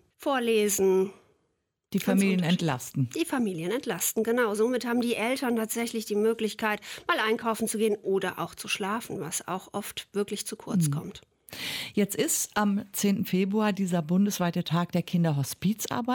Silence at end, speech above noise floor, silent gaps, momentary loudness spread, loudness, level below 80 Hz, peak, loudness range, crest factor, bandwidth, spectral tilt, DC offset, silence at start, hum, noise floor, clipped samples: 0 s; 49 dB; none; 8 LU; -28 LUFS; -68 dBFS; -12 dBFS; 4 LU; 16 dB; 17.5 kHz; -4.5 dB/octave; under 0.1%; 0.2 s; none; -77 dBFS; under 0.1%